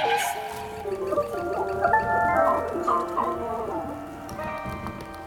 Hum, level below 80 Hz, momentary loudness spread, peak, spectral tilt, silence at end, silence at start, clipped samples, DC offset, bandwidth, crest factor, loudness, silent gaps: none; -50 dBFS; 12 LU; -8 dBFS; -4.5 dB/octave; 0 s; 0 s; under 0.1%; under 0.1%; 19 kHz; 18 dB; -26 LUFS; none